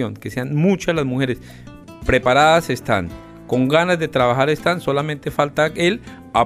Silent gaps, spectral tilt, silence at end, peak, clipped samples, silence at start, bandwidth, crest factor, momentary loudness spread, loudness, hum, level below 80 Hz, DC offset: none; -5.5 dB/octave; 0 s; -2 dBFS; under 0.1%; 0 s; 15.5 kHz; 16 dB; 11 LU; -18 LUFS; none; -40 dBFS; under 0.1%